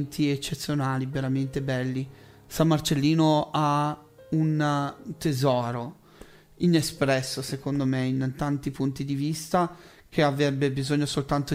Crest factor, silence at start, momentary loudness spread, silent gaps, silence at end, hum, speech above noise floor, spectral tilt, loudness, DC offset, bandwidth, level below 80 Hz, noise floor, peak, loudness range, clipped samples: 18 dB; 0 s; 8 LU; none; 0 s; none; 25 dB; -6 dB/octave; -26 LUFS; under 0.1%; 16 kHz; -54 dBFS; -50 dBFS; -8 dBFS; 2 LU; under 0.1%